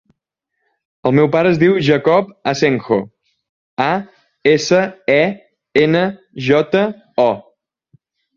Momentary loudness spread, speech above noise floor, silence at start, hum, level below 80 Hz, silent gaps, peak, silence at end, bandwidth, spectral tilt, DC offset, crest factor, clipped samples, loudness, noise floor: 9 LU; 62 dB; 1.05 s; none; -56 dBFS; 3.49-3.77 s; 0 dBFS; 0.95 s; 7.4 kHz; -6 dB/octave; under 0.1%; 16 dB; under 0.1%; -15 LUFS; -76 dBFS